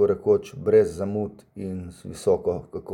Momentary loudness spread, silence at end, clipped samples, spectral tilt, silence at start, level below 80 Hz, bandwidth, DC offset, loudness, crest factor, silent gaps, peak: 15 LU; 0 s; under 0.1%; -7.5 dB/octave; 0 s; -54 dBFS; 11.5 kHz; under 0.1%; -24 LUFS; 16 dB; none; -8 dBFS